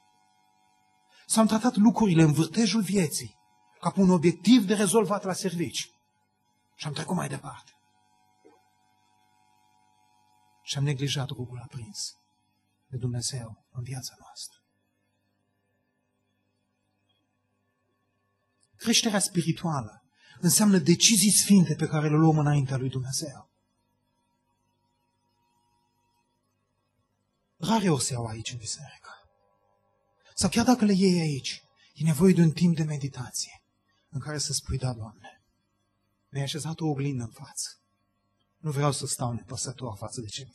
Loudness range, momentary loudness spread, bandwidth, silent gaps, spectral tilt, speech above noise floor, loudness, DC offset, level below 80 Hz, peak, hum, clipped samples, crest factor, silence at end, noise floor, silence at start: 16 LU; 18 LU; 12.5 kHz; none; -4.5 dB/octave; 50 dB; -25 LUFS; under 0.1%; -58 dBFS; -6 dBFS; 50 Hz at -50 dBFS; under 0.1%; 22 dB; 0.1 s; -75 dBFS; 1.3 s